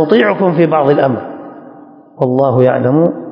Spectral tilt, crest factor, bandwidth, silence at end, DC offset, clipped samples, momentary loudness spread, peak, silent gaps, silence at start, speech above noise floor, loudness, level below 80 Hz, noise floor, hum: -10 dB/octave; 12 dB; 5.4 kHz; 0 s; under 0.1%; 0.2%; 14 LU; 0 dBFS; none; 0 s; 26 dB; -12 LUFS; -58 dBFS; -37 dBFS; none